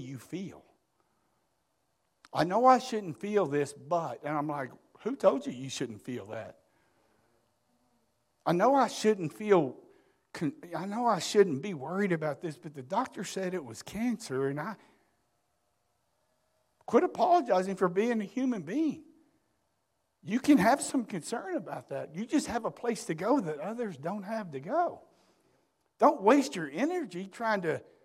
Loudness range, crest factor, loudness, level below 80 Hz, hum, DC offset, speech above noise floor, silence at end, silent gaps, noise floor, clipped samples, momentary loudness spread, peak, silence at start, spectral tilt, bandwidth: 6 LU; 22 dB; -30 LUFS; -72 dBFS; none; under 0.1%; 49 dB; 0.2 s; none; -79 dBFS; under 0.1%; 15 LU; -10 dBFS; 0 s; -5.5 dB/octave; 15.5 kHz